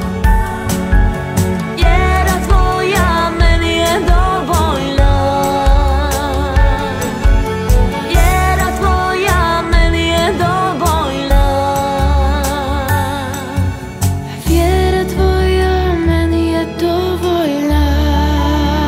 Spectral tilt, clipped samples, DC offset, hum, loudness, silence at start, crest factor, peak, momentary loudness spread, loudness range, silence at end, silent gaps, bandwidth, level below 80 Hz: -5.5 dB/octave; under 0.1%; under 0.1%; none; -14 LUFS; 0 s; 12 dB; 0 dBFS; 4 LU; 2 LU; 0 s; none; 16.5 kHz; -16 dBFS